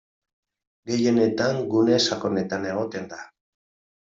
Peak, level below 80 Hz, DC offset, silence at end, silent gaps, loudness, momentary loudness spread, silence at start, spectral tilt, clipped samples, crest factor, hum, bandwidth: -8 dBFS; -64 dBFS; under 0.1%; 0.8 s; none; -23 LUFS; 16 LU; 0.85 s; -5 dB/octave; under 0.1%; 18 dB; none; 7.8 kHz